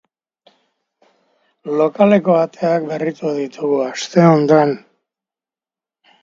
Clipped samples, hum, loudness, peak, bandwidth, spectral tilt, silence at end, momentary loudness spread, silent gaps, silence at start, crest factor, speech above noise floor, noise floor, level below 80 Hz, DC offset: under 0.1%; none; -15 LUFS; 0 dBFS; 7.8 kHz; -7 dB/octave; 1.45 s; 10 LU; none; 1.65 s; 18 dB; over 75 dB; under -90 dBFS; -66 dBFS; under 0.1%